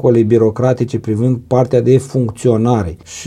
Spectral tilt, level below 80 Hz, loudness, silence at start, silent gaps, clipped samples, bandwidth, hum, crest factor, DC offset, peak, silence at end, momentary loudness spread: -8 dB/octave; -44 dBFS; -14 LUFS; 0 s; none; under 0.1%; 11.5 kHz; none; 14 dB; under 0.1%; 0 dBFS; 0 s; 6 LU